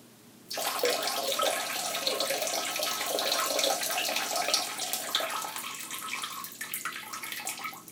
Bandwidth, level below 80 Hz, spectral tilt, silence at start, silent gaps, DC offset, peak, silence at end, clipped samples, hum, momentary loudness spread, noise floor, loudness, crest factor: 19 kHz; -82 dBFS; 0.5 dB/octave; 0 s; none; under 0.1%; -8 dBFS; 0 s; under 0.1%; none; 9 LU; -54 dBFS; -30 LUFS; 24 dB